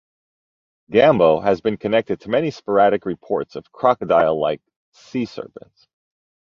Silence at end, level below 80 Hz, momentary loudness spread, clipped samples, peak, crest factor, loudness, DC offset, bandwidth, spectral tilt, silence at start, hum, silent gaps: 1.05 s; -56 dBFS; 14 LU; under 0.1%; -2 dBFS; 18 dB; -19 LUFS; under 0.1%; 7.2 kHz; -7 dB/octave; 0.9 s; none; 4.76-4.92 s